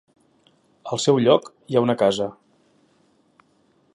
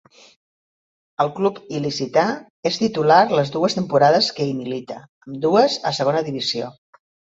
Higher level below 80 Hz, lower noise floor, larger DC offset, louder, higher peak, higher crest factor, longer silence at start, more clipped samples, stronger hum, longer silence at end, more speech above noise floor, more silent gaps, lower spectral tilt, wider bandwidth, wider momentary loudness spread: about the same, -66 dBFS vs -64 dBFS; second, -62 dBFS vs under -90 dBFS; neither; about the same, -21 LUFS vs -19 LUFS; about the same, -2 dBFS vs 0 dBFS; about the same, 22 dB vs 20 dB; second, 0.85 s vs 1.2 s; neither; neither; first, 1.65 s vs 0.65 s; second, 42 dB vs over 71 dB; second, none vs 2.50-2.63 s, 5.09-5.21 s; about the same, -5.5 dB/octave vs -5 dB/octave; first, 11.5 kHz vs 8 kHz; about the same, 13 LU vs 14 LU